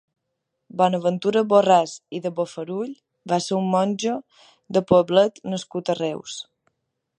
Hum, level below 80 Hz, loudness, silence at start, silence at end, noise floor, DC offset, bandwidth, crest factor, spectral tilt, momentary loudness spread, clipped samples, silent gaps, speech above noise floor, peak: none; -64 dBFS; -22 LUFS; 0.75 s; 0.75 s; -79 dBFS; under 0.1%; 10.5 kHz; 20 dB; -5.5 dB/octave; 15 LU; under 0.1%; none; 57 dB; -2 dBFS